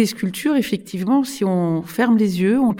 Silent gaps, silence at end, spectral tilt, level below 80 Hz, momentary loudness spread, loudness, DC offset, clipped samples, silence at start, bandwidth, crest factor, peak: none; 0 s; -6 dB/octave; -60 dBFS; 6 LU; -19 LUFS; under 0.1%; under 0.1%; 0 s; 17 kHz; 14 dB; -6 dBFS